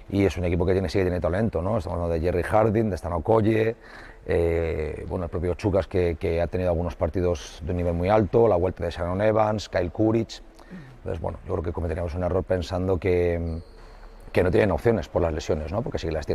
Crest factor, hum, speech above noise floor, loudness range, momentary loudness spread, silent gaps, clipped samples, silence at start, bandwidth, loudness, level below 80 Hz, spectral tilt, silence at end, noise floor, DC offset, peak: 18 dB; none; 20 dB; 4 LU; 10 LU; none; under 0.1%; 0 s; 12.5 kHz; -25 LUFS; -42 dBFS; -7.5 dB/octave; 0 s; -44 dBFS; under 0.1%; -8 dBFS